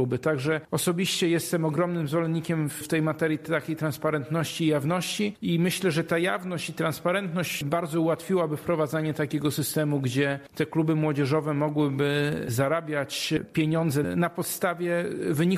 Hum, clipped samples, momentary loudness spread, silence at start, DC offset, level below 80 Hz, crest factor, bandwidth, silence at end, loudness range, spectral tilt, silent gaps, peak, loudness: none; under 0.1%; 4 LU; 0 s; under 0.1%; -62 dBFS; 14 dB; 14.5 kHz; 0 s; 1 LU; -5.5 dB/octave; none; -12 dBFS; -27 LUFS